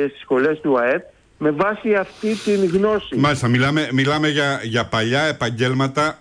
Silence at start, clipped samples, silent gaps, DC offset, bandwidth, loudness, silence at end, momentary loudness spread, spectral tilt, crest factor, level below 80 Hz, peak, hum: 0 s; under 0.1%; none; under 0.1%; 10.5 kHz; -19 LUFS; 0.05 s; 4 LU; -5.5 dB/octave; 12 dB; -50 dBFS; -8 dBFS; none